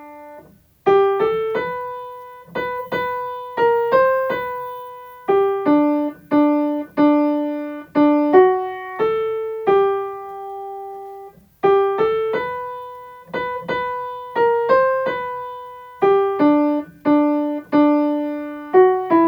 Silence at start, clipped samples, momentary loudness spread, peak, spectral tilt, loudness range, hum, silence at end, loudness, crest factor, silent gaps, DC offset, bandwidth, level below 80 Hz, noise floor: 0 s; under 0.1%; 16 LU; 0 dBFS; -7.5 dB/octave; 5 LU; none; 0 s; -19 LUFS; 18 dB; none; under 0.1%; over 20 kHz; -58 dBFS; -46 dBFS